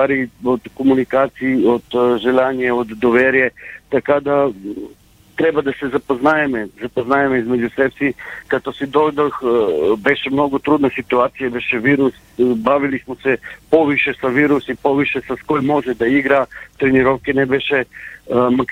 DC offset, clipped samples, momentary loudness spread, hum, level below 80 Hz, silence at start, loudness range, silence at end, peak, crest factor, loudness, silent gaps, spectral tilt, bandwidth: under 0.1%; under 0.1%; 7 LU; none; -48 dBFS; 0 s; 2 LU; 0 s; 0 dBFS; 16 dB; -17 LUFS; none; -7 dB/octave; 15 kHz